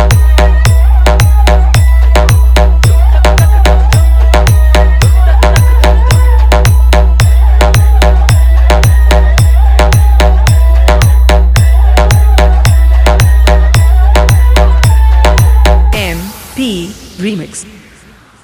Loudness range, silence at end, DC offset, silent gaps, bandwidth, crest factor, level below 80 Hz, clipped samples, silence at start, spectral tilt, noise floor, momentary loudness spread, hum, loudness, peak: 1 LU; 0.8 s; under 0.1%; none; 17.5 kHz; 6 dB; -6 dBFS; under 0.1%; 0 s; -5.5 dB/octave; -38 dBFS; 4 LU; none; -7 LUFS; 0 dBFS